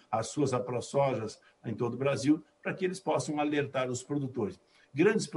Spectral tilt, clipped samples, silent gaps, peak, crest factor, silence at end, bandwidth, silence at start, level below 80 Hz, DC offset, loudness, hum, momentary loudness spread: -5.5 dB/octave; under 0.1%; none; -14 dBFS; 18 dB; 0 s; 11.5 kHz; 0.1 s; -72 dBFS; under 0.1%; -32 LUFS; none; 10 LU